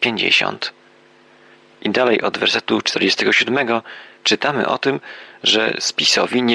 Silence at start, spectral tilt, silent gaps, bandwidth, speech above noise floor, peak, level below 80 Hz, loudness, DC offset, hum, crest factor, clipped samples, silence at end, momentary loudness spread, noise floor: 0 s; -2.5 dB/octave; none; 11.5 kHz; 32 dB; -2 dBFS; -66 dBFS; -17 LUFS; under 0.1%; none; 16 dB; under 0.1%; 0 s; 11 LU; -50 dBFS